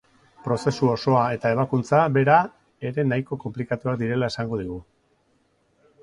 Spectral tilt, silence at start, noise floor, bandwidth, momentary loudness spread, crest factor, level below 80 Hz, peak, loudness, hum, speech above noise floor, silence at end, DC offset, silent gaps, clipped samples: -7 dB/octave; 0.45 s; -66 dBFS; 11 kHz; 13 LU; 20 dB; -56 dBFS; -4 dBFS; -23 LUFS; none; 43 dB; 1.2 s; under 0.1%; none; under 0.1%